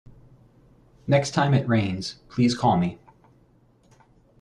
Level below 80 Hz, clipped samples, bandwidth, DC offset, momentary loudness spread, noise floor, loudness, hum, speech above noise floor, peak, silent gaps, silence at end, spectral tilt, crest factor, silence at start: -56 dBFS; under 0.1%; 10.5 kHz; under 0.1%; 11 LU; -59 dBFS; -23 LUFS; none; 37 dB; -6 dBFS; none; 1.45 s; -6.5 dB/octave; 20 dB; 1.05 s